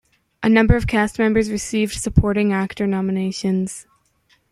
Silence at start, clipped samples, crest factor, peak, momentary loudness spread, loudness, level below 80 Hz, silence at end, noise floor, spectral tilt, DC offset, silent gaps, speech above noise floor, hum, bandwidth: 0.4 s; under 0.1%; 18 dB; -2 dBFS; 7 LU; -19 LUFS; -32 dBFS; 0.7 s; -61 dBFS; -6 dB/octave; under 0.1%; none; 43 dB; none; 13 kHz